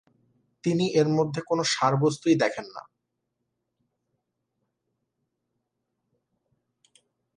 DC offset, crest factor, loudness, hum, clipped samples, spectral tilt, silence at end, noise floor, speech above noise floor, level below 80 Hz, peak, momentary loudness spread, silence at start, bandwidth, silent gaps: under 0.1%; 22 dB; -24 LUFS; none; under 0.1%; -5.5 dB/octave; 4.55 s; -81 dBFS; 57 dB; -70 dBFS; -8 dBFS; 13 LU; 0.65 s; 10.5 kHz; none